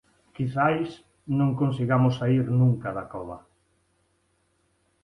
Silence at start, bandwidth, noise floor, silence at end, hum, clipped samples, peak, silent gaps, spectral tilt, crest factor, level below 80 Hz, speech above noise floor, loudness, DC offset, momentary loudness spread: 0.4 s; 6.2 kHz; -70 dBFS; 1.65 s; none; under 0.1%; -8 dBFS; none; -9 dB/octave; 18 dB; -58 dBFS; 46 dB; -25 LUFS; under 0.1%; 15 LU